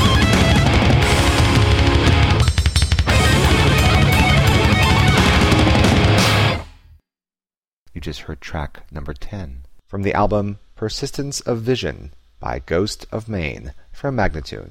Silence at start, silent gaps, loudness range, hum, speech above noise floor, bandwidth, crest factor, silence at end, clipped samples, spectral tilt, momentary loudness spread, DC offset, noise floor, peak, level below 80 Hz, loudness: 0 s; 7.58-7.62 s, 7.73-7.86 s; 11 LU; none; over 67 dB; 16.5 kHz; 12 dB; 0 s; under 0.1%; -5 dB/octave; 18 LU; under 0.1%; under -90 dBFS; -4 dBFS; -24 dBFS; -16 LUFS